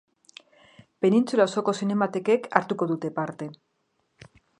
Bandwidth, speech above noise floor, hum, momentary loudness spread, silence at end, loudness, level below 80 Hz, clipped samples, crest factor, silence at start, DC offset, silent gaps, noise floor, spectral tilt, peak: 11 kHz; 49 dB; none; 10 LU; 1.05 s; -25 LUFS; -74 dBFS; under 0.1%; 24 dB; 1 s; under 0.1%; none; -73 dBFS; -6 dB/octave; -2 dBFS